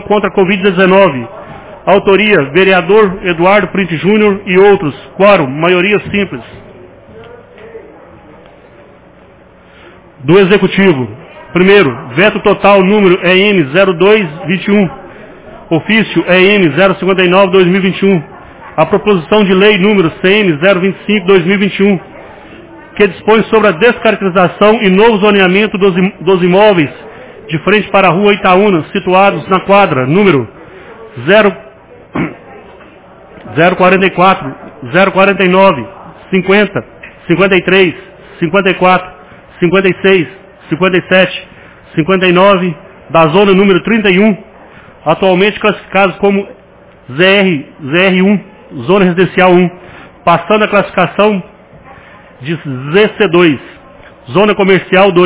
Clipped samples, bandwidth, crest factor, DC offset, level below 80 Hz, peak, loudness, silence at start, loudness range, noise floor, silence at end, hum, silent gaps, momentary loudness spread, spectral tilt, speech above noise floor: 1%; 4 kHz; 10 dB; under 0.1%; -42 dBFS; 0 dBFS; -9 LUFS; 0 s; 4 LU; -39 dBFS; 0 s; none; none; 12 LU; -10 dB/octave; 31 dB